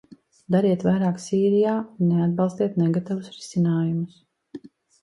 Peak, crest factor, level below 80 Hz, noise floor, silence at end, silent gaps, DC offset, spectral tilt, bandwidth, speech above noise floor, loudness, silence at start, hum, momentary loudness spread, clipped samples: -8 dBFS; 16 dB; -64 dBFS; -43 dBFS; 0.35 s; none; under 0.1%; -8 dB/octave; 11 kHz; 21 dB; -23 LUFS; 0.5 s; none; 14 LU; under 0.1%